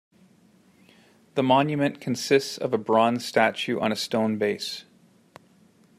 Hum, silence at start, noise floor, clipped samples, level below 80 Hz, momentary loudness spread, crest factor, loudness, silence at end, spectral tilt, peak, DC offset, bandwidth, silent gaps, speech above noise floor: none; 1.35 s; -58 dBFS; under 0.1%; -72 dBFS; 9 LU; 22 dB; -24 LUFS; 1.15 s; -5 dB/octave; -4 dBFS; under 0.1%; 15 kHz; none; 35 dB